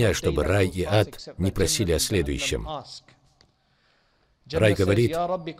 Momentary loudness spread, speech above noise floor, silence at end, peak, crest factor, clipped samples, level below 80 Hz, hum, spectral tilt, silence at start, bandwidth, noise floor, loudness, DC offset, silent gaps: 10 LU; 42 dB; 0.05 s; -6 dBFS; 20 dB; under 0.1%; -40 dBFS; none; -5 dB/octave; 0 s; 16 kHz; -65 dBFS; -24 LUFS; under 0.1%; none